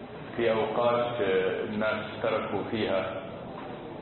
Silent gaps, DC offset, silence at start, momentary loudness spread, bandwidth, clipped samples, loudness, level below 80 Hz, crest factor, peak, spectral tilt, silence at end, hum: none; under 0.1%; 0 s; 13 LU; 4.3 kHz; under 0.1%; -29 LUFS; -58 dBFS; 16 dB; -14 dBFS; -9.5 dB/octave; 0 s; none